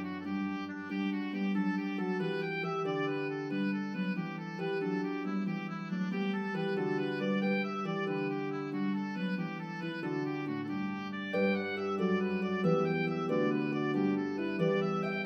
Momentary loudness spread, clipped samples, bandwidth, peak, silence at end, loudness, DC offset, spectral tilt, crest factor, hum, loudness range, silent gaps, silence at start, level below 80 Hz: 6 LU; under 0.1%; 6.6 kHz; -16 dBFS; 0 s; -34 LUFS; under 0.1%; -8 dB/octave; 16 dB; none; 4 LU; none; 0 s; -80 dBFS